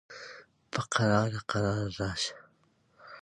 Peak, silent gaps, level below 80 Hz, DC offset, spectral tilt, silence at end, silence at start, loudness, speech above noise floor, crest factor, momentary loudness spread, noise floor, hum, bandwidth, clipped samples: -10 dBFS; none; -56 dBFS; under 0.1%; -5 dB/octave; 0.05 s; 0.1 s; -31 LUFS; 39 dB; 22 dB; 20 LU; -68 dBFS; none; 11 kHz; under 0.1%